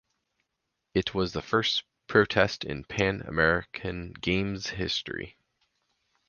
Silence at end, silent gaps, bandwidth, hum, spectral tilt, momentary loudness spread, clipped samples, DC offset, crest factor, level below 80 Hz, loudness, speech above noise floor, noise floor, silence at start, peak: 1 s; none; 7.2 kHz; none; -5 dB/octave; 11 LU; under 0.1%; under 0.1%; 24 dB; -50 dBFS; -28 LUFS; 54 dB; -82 dBFS; 0.95 s; -6 dBFS